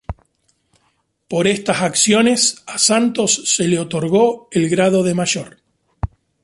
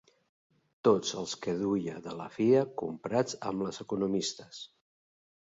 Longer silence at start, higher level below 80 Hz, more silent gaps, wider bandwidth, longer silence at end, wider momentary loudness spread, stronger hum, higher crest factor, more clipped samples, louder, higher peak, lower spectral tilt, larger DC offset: second, 0.1 s vs 0.85 s; first, -42 dBFS vs -70 dBFS; neither; first, 11.5 kHz vs 7.8 kHz; second, 0.4 s vs 0.8 s; about the same, 16 LU vs 15 LU; neither; about the same, 16 dB vs 20 dB; neither; first, -16 LUFS vs -31 LUFS; first, -2 dBFS vs -12 dBFS; second, -3.5 dB/octave vs -5 dB/octave; neither